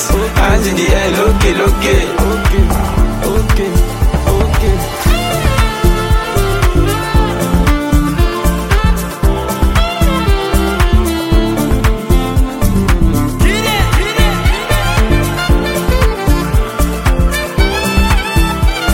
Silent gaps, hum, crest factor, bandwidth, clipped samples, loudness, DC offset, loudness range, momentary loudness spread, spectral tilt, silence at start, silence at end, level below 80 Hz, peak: none; none; 12 dB; 17 kHz; under 0.1%; -13 LUFS; under 0.1%; 1 LU; 3 LU; -5.5 dB/octave; 0 s; 0 s; -14 dBFS; 0 dBFS